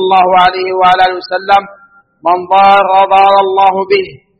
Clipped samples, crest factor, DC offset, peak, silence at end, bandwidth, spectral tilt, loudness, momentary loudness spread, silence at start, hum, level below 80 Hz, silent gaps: 0.4%; 10 dB; under 0.1%; 0 dBFS; 0.25 s; 6.6 kHz; -5.5 dB/octave; -9 LUFS; 7 LU; 0 s; none; -46 dBFS; none